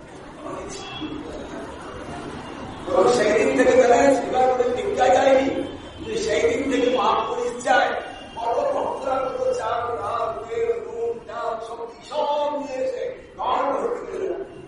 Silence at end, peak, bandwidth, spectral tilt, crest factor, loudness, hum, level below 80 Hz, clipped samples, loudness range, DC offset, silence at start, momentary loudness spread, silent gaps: 0 s; -4 dBFS; 11.5 kHz; -4 dB/octave; 18 dB; -22 LUFS; none; -50 dBFS; under 0.1%; 8 LU; under 0.1%; 0 s; 17 LU; none